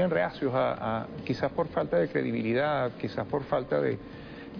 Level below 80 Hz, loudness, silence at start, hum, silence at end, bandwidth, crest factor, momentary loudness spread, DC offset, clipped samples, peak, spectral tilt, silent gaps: -58 dBFS; -29 LUFS; 0 s; none; 0 s; 5.4 kHz; 14 dB; 7 LU; under 0.1%; under 0.1%; -14 dBFS; -8.5 dB/octave; none